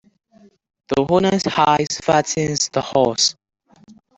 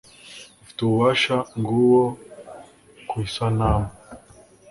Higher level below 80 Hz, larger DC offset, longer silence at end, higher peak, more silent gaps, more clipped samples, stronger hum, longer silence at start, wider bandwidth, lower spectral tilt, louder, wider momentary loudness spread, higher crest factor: second, -52 dBFS vs -40 dBFS; neither; second, 0.25 s vs 0.55 s; first, -2 dBFS vs -6 dBFS; neither; neither; neither; first, 0.9 s vs 0.25 s; second, 8.4 kHz vs 11.5 kHz; second, -3.5 dB/octave vs -6.5 dB/octave; first, -18 LUFS vs -21 LUFS; second, 4 LU vs 24 LU; about the same, 18 dB vs 18 dB